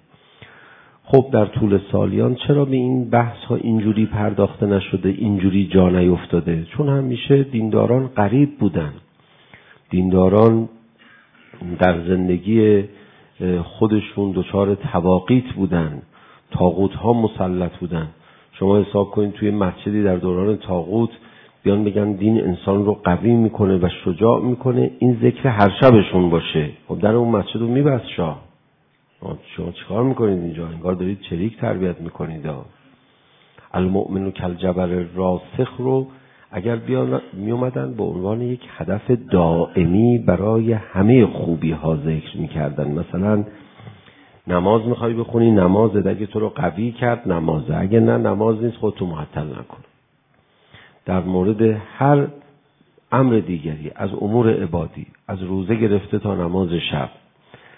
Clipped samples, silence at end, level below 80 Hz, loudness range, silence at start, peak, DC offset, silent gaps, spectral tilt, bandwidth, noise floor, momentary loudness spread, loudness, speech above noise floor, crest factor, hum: under 0.1%; 0.7 s; -50 dBFS; 6 LU; 1.05 s; 0 dBFS; under 0.1%; none; -11.5 dB/octave; 4 kHz; -60 dBFS; 11 LU; -19 LUFS; 42 dB; 18 dB; none